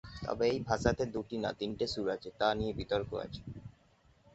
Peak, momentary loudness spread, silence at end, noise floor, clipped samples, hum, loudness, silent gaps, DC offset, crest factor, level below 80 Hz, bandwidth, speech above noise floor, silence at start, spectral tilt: -14 dBFS; 14 LU; 0.65 s; -66 dBFS; under 0.1%; none; -35 LUFS; none; under 0.1%; 22 dB; -52 dBFS; 8 kHz; 32 dB; 0.05 s; -4.5 dB/octave